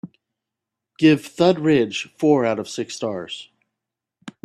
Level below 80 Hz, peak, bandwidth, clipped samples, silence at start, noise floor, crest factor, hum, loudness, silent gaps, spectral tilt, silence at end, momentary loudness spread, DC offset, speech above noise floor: -62 dBFS; -2 dBFS; 12.5 kHz; under 0.1%; 0.05 s; -84 dBFS; 18 dB; none; -20 LUFS; none; -5.5 dB/octave; 0.15 s; 12 LU; under 0.1%; 65 dB